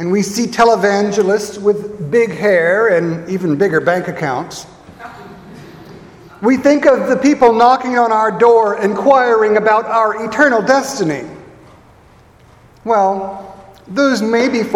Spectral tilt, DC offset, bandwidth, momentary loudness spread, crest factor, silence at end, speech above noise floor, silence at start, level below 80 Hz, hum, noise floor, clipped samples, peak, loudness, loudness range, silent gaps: -5 dB/octave; under 0.1%; 16.5 kHz; 12 LU; 14 dB; 0 s; 32 dB; 0 s; -52 dBFS; none; -45 dBFS; under 0.1%; 0 dBFS; -13 LUFS; 8 LU; none